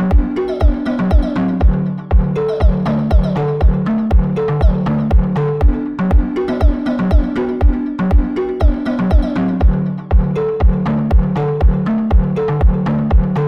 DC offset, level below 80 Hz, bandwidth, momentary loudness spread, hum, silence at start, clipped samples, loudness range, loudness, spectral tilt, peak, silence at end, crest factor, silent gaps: under 0.1%; -16 dBFS; 5.6 kHz; 2 LU; none; 0 s; under 0.1%; 1 LU; -16 LUFS; -10 dB/octave; -2 dBFS; 0 s; 12 dB; none